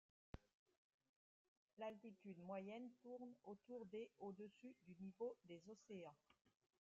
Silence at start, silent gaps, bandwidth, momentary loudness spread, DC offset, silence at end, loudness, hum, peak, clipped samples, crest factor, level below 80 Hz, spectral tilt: 0.35 s; 0.54-0.66 s, 0.77-0.99 s, 1.09-1.77 s, 6.41-6.45 s; 7.4 kHz; 10 LU; under 0.1%; 0.4 s; -58 LUFS; none; -40 dBFS; under 0.1%; 18 dB; -80 dBFS; -6 dB/octave